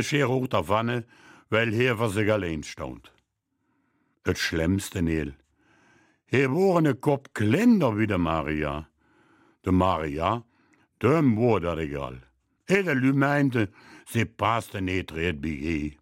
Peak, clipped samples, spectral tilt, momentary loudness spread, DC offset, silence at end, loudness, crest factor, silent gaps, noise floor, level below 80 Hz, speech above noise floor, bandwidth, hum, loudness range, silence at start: -6 dBFS; under 0.1%; -6.5 dB/octave; 11 LU; under 0.1%; 0.1 s; -25 LUFS; 20 dB; none; -76 dBFS; -48 dBFS; 51 dB; 16 kHz; none; 5 LU; 0 s